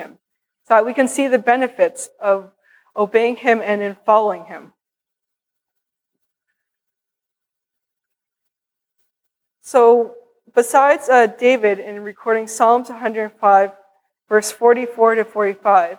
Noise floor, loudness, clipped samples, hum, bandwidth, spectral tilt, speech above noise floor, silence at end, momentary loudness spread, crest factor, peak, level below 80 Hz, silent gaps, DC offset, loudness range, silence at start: -84 dBFS; -16 LUFS; under 0.1%; none; 15.5 kHz; -3.5 dB/octave; 68 dB; 0.05 s; 10 LU; 18 dB; -2 dBFS; -78 dBFS; none; under 0.1%; 6 LU; 0 s